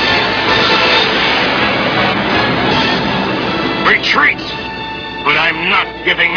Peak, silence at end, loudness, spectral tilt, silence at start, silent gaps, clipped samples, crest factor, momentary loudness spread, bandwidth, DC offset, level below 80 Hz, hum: 0 dBFS; 0 s; -12 LUFS; -4.5 dB/octave; 0 s; none; under 0.1%; 14 dB; 8 LU; 5.4 kHz; under 0.1%; -38 dBFS; none